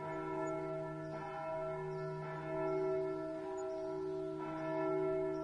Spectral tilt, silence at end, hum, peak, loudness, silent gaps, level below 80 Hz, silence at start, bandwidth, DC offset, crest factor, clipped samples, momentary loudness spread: -7.5 dB/octave; 0 s; none; -26 dBFS; -40 LUFS; none; -68 dBFS; 0 s; 10 kHz; under 0.1%; 14 dB; under 0.1%; 6 LU